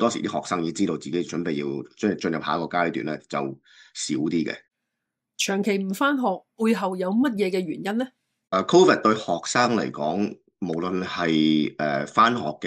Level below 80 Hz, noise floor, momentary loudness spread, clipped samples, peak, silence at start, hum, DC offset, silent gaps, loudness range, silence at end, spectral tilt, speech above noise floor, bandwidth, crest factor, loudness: -68 dBFS; -83 dBFS; 10 LU; under 0.1%; -4 dBFS; 0 s; none; under 0.1%; none; 5 LU; 0 s; -4.5 dB/octave; 59 dB; 15.5 kHz; 20 dB; -24 LUFS